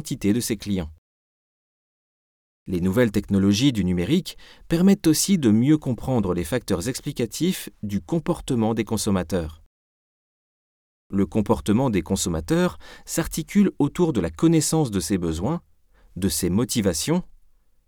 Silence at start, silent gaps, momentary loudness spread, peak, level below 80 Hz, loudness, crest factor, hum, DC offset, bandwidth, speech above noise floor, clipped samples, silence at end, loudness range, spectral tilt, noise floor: 0 s; 0.98-2.66 s, 9.66-11.10 s; 9 LU; -6 dBFS; -44 dBFS; -23 LUFS; 16 dB; none; under 0.1%; 20 kHz; 34 dB; under 0.1%; 0.6 s; 6 LU; -5.5 dB/octave; -56 dBFS